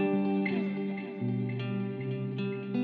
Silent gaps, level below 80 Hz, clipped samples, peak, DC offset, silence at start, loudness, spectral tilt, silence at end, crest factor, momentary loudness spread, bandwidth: none; -84 dBFS; under 0.1%; -18 dBFS; under 0.1%; 0 s; -33 LUFS; -7.5 dB/octave; 0 s; 12 dB; 6 LU; 4.8 kHz